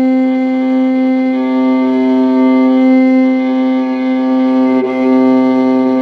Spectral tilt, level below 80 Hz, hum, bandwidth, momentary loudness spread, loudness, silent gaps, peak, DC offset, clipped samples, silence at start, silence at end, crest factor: -7 dB/octave; -64 dBFS; none; 4.9 kHz; 4 LU; -11 LUFS; none; -2 dBFS; under 0.1%; under 0.1%; 0 s; 0 s; 8 dB